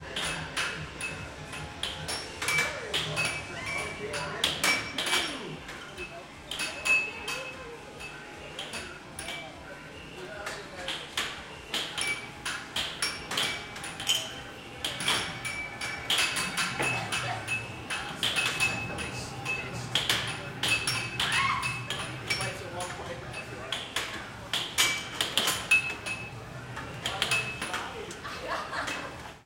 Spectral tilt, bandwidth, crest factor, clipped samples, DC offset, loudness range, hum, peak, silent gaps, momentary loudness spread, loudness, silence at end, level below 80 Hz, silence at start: -1.5 dB/octave; 16.5 kHz; 26 dB; under 0.1%; under 0.1%; 6 LU; none; -8 dBFS; none; 14 LU; -30 LUFS; 0 s; -54 dBFS; 0 s